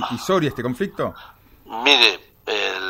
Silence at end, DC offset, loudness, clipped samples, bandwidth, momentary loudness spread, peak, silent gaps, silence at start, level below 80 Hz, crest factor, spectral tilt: 0 s; under 0.1%; -18 LUFS; under 0.1%; 16 kHz; 16 LU; 0 dBFS; none; 0 s; -54 dBFS; 22 dB; -3.5 dB/octave